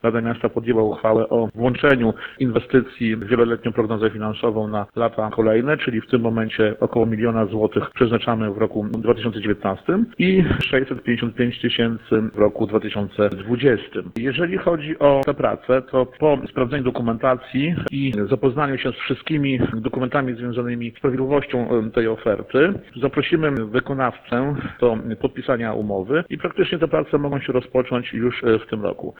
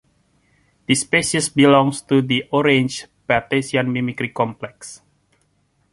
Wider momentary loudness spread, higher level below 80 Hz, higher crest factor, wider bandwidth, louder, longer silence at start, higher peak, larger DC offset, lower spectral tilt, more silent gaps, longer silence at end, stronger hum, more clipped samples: second, 5 LU vs 19 LU; first, -46 dBFS vs -54 dBFS; about the same, 18 dB vs 20 dB; second, 4.6 kHz vs 11.5 kHz; second, -21 LUFS vs -18 LUFS; second, 0.05 s vs 0.9 s; about the same, -2 dBFS vs 0 dBFS; neither; first, -9 dB/octave vs -4.5 dB/octave; neither; second, 0.1 s vs 0.95 s; neither; neither